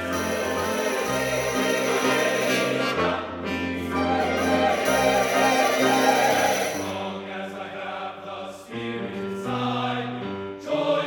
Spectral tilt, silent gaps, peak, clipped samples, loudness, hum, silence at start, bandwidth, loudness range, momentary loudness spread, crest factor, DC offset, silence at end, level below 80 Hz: -3.5 dB/octave; none; -6 dBFS; under 0.1%; -24 LUFS; none; 0 s; 19 kHz; 9 LU; 13 LU; 18 dB; under 0.1%; 0 s; -54 dBFS